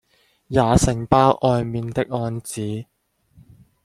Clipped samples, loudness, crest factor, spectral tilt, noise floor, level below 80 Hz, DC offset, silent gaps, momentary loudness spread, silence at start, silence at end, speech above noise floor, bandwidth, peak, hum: under 0.1%; -20 LUFS; 20 dB; -6 dB/octave; -54 dBFS; -38 dBFS; under 0.1%; none; 12 LU; 0.5 s; 1 s; 35 dB; 13.5 kHz; -2 dBFS; none